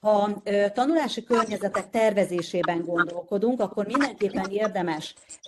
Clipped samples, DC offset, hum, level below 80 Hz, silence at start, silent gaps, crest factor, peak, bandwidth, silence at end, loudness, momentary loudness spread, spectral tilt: under 0.1%; under 0.1%; none; -66 dBFS; 0.05 s; none; 18 dB; -8 dBFS; 12.5 kHz; 0 s; -25 LUFS; 5 LU; -5.5 dB/octave